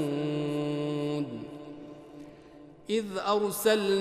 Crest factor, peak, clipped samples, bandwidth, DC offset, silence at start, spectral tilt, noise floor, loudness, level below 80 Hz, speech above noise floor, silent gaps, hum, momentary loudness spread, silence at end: 18 dB; -12 dBFS; under 0.1%; 15 kHz; under 0.1%; 0 s; -5 dB/octave; -51 dBFS; -30 LUFS; -68 dBFS; 24 dB; none; none; 22 LU; 0 s